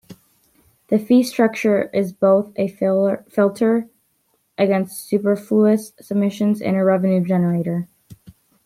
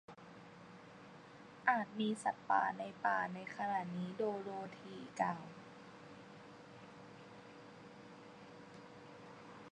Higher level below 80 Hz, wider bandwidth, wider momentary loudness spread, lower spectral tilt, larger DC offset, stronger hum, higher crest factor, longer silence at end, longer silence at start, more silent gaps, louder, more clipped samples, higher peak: first, -64 dBFS vs -84 dBFS; first, 15 kHz vs 10 kHz; second, 7 LU vs 21 LU; first, -7.5 dB/octave vs -5.5 dB/octave; neither; neither; second, 14 dB vs 26 dB; first, 0.5 s vs 0 s; about the same, 0.1 s vs 0.1 s; neither; first, -19 LUFS vs -39 LUFS; neither; first, -4 dBFS vs -18 dBFS